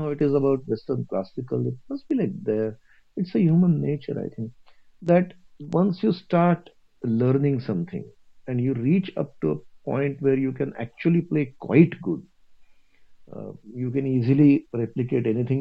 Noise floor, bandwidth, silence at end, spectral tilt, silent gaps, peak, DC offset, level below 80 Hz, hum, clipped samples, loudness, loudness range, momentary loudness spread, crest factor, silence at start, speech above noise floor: -51 dBFS; 5.4 kHz; 0 s; -10.5 dB/octave; none; -2 dBFS; under 0.1%; -60 dBFS; none; under 0.1%; -24 LUFS; 2 LU; 14 LU; 22 dB; 0 s; 28 dB